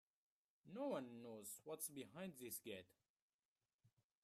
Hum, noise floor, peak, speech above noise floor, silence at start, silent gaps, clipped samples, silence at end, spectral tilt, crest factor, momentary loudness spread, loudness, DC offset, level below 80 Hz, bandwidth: none; under -90 dBFS; -34 dBFS; over 38 dB; 0.65 s; 3.09-3.16 s, 3.22-3.56 s, 3.73-3.79 s; under 0.1%; 0.35 s; -4 dB/octave; 22 dB; 8 LU; -52 LUFS; under 0.1%; under -90 dBFS; 15.5 kHz